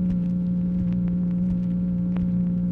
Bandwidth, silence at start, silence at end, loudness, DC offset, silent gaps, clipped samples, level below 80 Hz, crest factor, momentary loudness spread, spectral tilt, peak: 2.8 kHz; 0 s; 0 s; -24 LUFS; under 0.1%; none; under 0.1%; -40 dBFS; 8 dB; 1 LU; -12 dB/octave; -14 dBFS